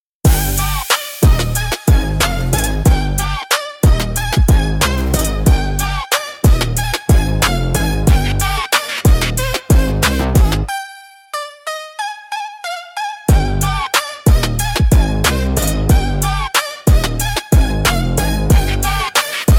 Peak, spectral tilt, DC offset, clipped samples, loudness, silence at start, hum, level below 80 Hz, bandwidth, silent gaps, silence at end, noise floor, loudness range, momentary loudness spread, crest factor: 0 dBFS; -4.5 dB/octave; under 0.1%; under 0.1%; -15 LUFS; 0.25 s; none; -18 dBFS; 18 kHz; none; 0 s; -36 dBFS; 3 LU; 10 LU; 14 dB